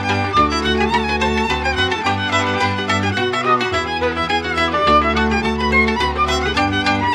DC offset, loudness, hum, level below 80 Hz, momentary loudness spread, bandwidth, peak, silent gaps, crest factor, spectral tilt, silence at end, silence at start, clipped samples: under 0.1%; -17 LUFS; none; -32 dBFS; 4 LU; 13 kHz; -4 dBFS; none; 14 dB; -4.5 dB/octave; 0 s; 0 s; under 0.1%